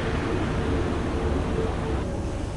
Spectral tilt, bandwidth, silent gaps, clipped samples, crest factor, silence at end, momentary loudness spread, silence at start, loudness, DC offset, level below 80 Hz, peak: -7 dB/octave; 11.5 kHz; none; under 0.1%; 14 dB; 0 s; 3 LU; 0 s; -27 LUFS; 0.2%; -32 dBFS; -12 dBFS